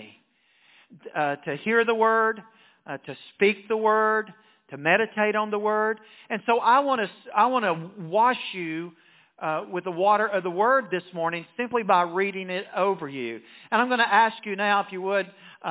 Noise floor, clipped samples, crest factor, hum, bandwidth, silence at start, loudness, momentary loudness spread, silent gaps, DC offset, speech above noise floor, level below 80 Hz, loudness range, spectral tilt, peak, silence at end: -64 dBFS; under 0.1%; 20 dB; none; 4 kHz; 0 s; -24 LUFS; 14 LU; none; under 0.1%; 39 dB; -80 dBFS; 2 LU; -8.5 dB/octave; -6 dBFS; 0 s